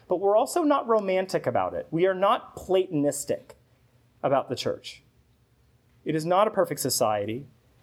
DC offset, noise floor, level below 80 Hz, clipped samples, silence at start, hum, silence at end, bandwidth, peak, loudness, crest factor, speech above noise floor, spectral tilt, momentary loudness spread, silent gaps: under 0.1%; -63 dBFS; -64 dBFS; under 0.1%; 0.1 s; none; 0.4 s; 16.5 kHz; -10 dBFS; -26 LUFS; 18 dB; 38 dB; -4.5 dB/octave; 10 LU; none